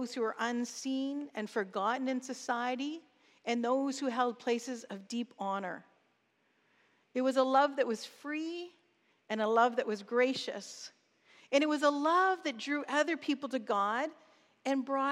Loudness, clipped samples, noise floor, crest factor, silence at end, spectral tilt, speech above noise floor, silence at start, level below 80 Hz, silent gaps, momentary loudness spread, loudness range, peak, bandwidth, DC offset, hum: -33 LUFS; under 0.1%; -75 dBFS; 20 dB; 0 s; -3.5 dB/octave; 42 dB; 0 s; under -90 dBFS; none; 13 LU; 4 LU; -14 dBFS; 13 kHz; under 0.1%; none